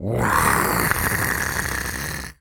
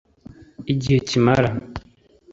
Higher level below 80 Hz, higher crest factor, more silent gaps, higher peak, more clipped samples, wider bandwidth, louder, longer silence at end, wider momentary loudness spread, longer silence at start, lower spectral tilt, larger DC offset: first, -36 dBFS vs -44 dBFS; about the same, 22 dB vs 20 dB; neither; about the same, 0 dBFS vs -2 dBFS; neither; first, over 20 kHz vs 7.8 kHz; about the same, -21 LUFS vs -20 LUFS; second, 0.05 s vs 0.5 s; second, 9 LU vs 20 LU; second, 0 s vs 0.6 s; second, -3.5 dB/octave vs -6.5 dB/octave; neither